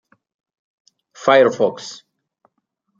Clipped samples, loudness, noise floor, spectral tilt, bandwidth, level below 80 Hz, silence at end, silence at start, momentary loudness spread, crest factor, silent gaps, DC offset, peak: under 0.1%; -16 LUFS; -72 dBFS; -4.5 dB/octave; 7.6 kHz; -66 dBFS; 1.05 s; 1.2 s; 21 LU; 20 dB; none; under 0.1%; -2 dBFS